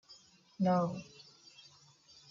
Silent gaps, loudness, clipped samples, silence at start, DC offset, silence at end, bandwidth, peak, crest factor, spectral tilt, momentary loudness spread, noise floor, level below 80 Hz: none; -34 LUFS; under 0.1%; 0.1 s; under 0.1%; 1.3 s; 7.4 kHz; -20 dBFS; 18 dB; -7.5 dB/octave; 26 LU; -63 dBFS; -76 dBFS